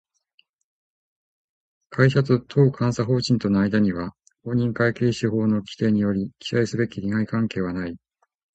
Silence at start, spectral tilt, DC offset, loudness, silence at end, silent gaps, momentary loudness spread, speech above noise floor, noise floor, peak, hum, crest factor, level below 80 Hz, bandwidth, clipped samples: 1.9 s; -7 dB/octave; under 0.1%; -22 LUFS; 0.6 s; none; 11 LU; 44 dB; -65 dBFS; -2 dBFS; none; 20 dB; -52 dBFS; 8.4 kHz; under 0.1%